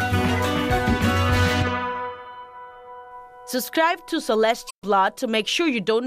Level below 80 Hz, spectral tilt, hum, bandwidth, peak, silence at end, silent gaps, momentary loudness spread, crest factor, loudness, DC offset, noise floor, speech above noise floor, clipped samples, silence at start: -40 dBFS; -5 dB/octave; none; 15.5 kHz; -8 dBFS; 0 s; 4.71-4.82 s; 21 LU; 16 dB; -22 LUFS; under 0.1%; -41 dBFS; 19 dB; under 0.1%; 0 s